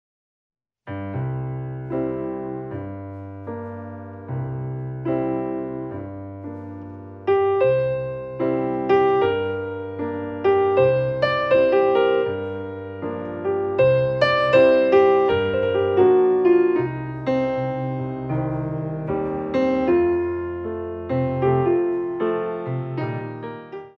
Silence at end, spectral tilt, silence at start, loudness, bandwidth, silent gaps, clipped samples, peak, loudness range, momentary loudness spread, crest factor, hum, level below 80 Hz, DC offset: 0.1 s; -9 dB/octave; 0.85 s; -21 LUFS; 5.8 kHz; none; under 0.1%; -4 dBFS; 12 LU; 16 LU; 18 dB; none; -52 dBFS; under 0.1%